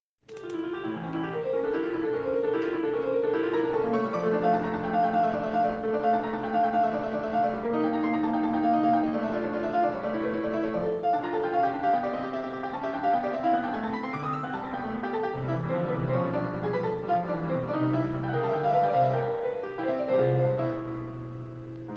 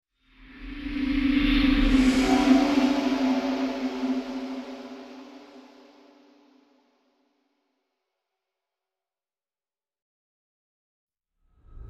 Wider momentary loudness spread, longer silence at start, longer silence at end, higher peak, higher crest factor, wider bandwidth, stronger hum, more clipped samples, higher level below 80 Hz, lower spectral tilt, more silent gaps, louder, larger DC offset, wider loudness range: second, 8 LU vs 21 LU; about the same, 0.3 s vs 0.4 s; about the same, 0 s vs 0 s; second, -12 dBFS vs -8 dBFS; second, 14 dB vs 20 dB; second, 6.8 kHz vs 12 kHz; neither; neither; second, -58 dBFS vs -38 dBFS; first, -9 dB/octave vs -5 dB/octave; second, none vs 10.02-11.07 s; second, -28 LUFS vs -24 LUFS; neither; second, 3 LU vs 17 LU